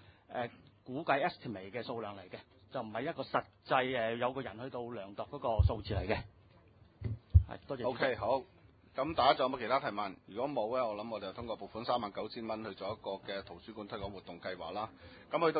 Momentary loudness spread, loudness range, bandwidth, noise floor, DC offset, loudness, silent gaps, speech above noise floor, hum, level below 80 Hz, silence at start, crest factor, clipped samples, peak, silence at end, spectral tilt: 14 LU; 7 LU; 4.9 kHz; -62 dBFS; under 0.1%; -37 LUFS; none; 26 dB; none; -44 dBFS; 0.1 s; 26 dB; under 0.1%; -12 dBFS; 0 s; -4.5 dB/octave